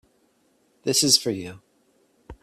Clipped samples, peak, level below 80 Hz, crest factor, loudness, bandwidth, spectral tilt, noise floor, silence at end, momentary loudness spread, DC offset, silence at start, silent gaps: under 0.1%; -2 dBFS; -58 dBFS; 24 dB; -21 LUFS; 16 kHz; -2 dB/octave; -65 dBFS; 0.1 s; 17 LU; under 0.1%; 0.85 s; none